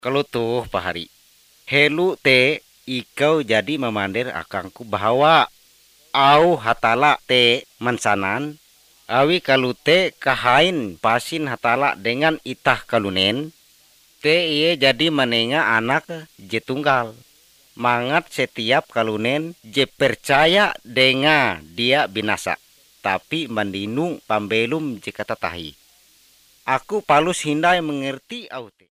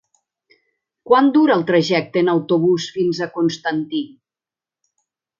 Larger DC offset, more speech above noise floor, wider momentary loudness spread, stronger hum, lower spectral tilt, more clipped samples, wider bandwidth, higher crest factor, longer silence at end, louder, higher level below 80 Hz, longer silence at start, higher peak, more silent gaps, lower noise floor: neither; second, 35 dB vs 73 dB; first, 13 LU vs 9 LU; neither; second, -4.5 dB/octave vs -6 dB/octave; neither; first, 15.5 kHz vs 7.4 kHz; about the same, 20 dB vs 18 dB; second, 0.2 s vs 1.3 s; about the same, -19 LUFS vs -17 LUFS; first, -54 dBFS vs -66 dBFS; second, 0.05 s vs 1.05 s; about the same, 0 dBFS vs 0 dBFS; neither; second, -55 dBFS vs -90 dBFS